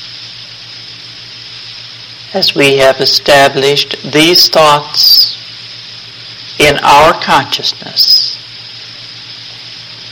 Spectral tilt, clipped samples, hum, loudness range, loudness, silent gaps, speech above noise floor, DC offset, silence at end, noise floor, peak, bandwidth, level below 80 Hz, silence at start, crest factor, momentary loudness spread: -2.5 dB/octave; 0.3%; none; 4 LU; -7 LUFS; none; 21 dB; under 0.1%; 0 s; -29 dBFS; 0 dBFS; over 20 kHz; -42 dBFS; 0 s; 12 dB; 21 LU